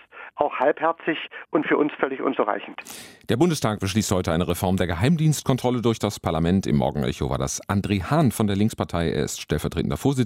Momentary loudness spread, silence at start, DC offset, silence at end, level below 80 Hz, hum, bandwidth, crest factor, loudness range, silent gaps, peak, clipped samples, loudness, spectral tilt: 6 LU; 0.15 s; under 0.1%; 0 s; -46 dBFS; none; 16 kHz; 20 dB; 2 LU; none; -4 dBFS; under 0.1%; -23 LUFS; -5.5 dB/octave